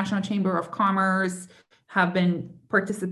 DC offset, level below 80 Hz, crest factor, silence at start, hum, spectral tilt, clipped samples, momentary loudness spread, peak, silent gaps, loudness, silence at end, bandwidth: under 0.1%; -68 dBFS; 18 dB; 0 s; none; -6 dB/octave; under 0.1%; 7 LU; -8 dBFS; none; -25 LUFS; 0 s; 12 kHz